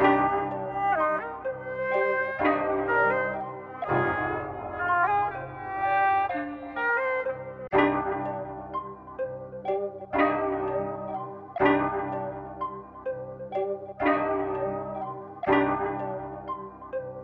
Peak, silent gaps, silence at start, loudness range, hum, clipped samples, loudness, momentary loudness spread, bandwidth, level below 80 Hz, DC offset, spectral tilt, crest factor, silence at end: -8 dBFS; none; 0 s; 4 LU; none; under 0.1%; -28 LUFS; 12 LU; 5.6 kHz; -56 dBFS; under 0.1%; -8.5 dB/octave; 20 dB; 0 s